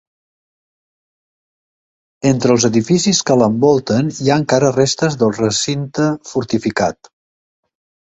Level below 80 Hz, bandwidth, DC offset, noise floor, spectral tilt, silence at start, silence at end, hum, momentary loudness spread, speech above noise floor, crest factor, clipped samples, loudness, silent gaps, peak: -52 dBFS; 8.4 kHz; under 0.1%; under -90 dBFS; -5 dB/octave; 2.25 s; 1.15 s; none; 6 LU; over 75 dB; 16 dB; under 0.1%; -15 LUFS; none; 0 dBFS